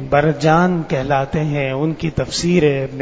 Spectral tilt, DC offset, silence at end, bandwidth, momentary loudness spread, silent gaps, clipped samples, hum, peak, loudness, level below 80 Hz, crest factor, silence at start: -6 dB/octave; under 0.1%; 0 s; 8 kHz; 6 LU; none; under 0.1%; none; 0 dBFS; -17 LUFS; -38 dBFS; 16 dB; 0 s